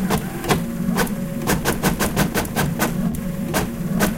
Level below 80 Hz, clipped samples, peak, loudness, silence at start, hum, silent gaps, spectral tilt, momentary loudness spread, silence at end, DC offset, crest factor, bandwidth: -34 dBFS; under 0.1%; -4 dBFS; -22 LUFS; 0 s; none; none; -5 dB/octave; 4 LU; 0 s; under 0.1%; 18 dB; 17 kHz